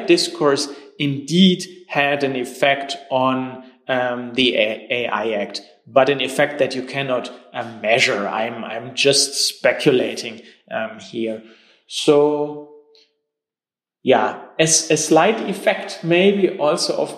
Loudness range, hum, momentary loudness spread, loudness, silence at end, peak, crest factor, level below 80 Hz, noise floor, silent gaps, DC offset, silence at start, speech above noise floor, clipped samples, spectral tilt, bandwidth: 4 LU; none; 13 LU; -18 LUFS; 0 s; -2 dBFS; 18 dB; -66 dBFS; under -90 dBFS; none; under 0.1%; 0 s; over 71 dB; under 0.1%; -3.5 dB/octave; 15.5 kHz